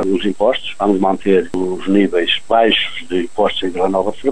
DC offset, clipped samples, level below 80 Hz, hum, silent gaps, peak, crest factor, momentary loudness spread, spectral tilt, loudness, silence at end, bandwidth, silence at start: 4%; under 0.1%; -44 dBFS; none; none; -2 dBFS; 14 dB; 6 LU; -5.5 dB/octave; -16 LUFS; 0 s; 10.5 kHz; 0 s